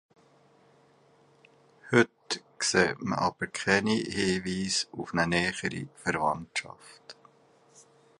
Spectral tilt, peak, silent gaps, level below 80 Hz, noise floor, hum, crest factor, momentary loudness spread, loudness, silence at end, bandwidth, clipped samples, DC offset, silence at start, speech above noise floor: -4 dB/octave; -6 dBFS; none; -60 dBFS; -62 dBFS; none; 24 dB; 10 LU; -28 LUFS; 1.1 s; 11.5 kHz; under 0.1%; under 0.1%; 1.85 s; 32 dB